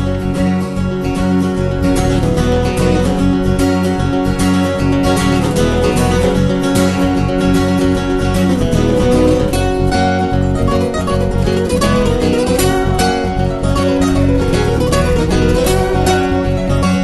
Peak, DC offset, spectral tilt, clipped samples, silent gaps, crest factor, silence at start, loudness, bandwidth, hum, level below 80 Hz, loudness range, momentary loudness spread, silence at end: 0 dBFS; under 0.1%; -6 dB/octave; under 0.1%; none; 12 dB; 0 s; -14 LUFS; 12.5 kHz; none; -22 dBFS; 1 LU; 3 LU; 0 s